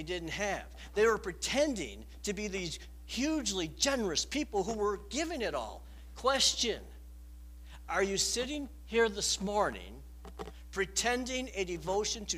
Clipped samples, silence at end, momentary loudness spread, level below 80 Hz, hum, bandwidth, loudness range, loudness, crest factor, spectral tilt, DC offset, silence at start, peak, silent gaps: under 0.1%; 0 s; 20 LU; -50 dBFS; none; 15.5 kHz; 2 LU; -33 LUFS; 20 dB; -2.5 dB/octave; under 0.1%; 0 s; -14 dBFS; none